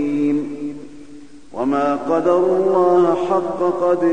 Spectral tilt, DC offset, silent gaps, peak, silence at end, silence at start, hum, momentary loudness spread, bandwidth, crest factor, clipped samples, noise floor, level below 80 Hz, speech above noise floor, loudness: -7.5 dB/octave; 1%; none; -4 dBFS; 0 s; 0 s; none; 15 LU; 9.2 kHz; 14 dB; under 0.1%; -41 dBFS; -56 dBFS; 25 dB; -18 LUFS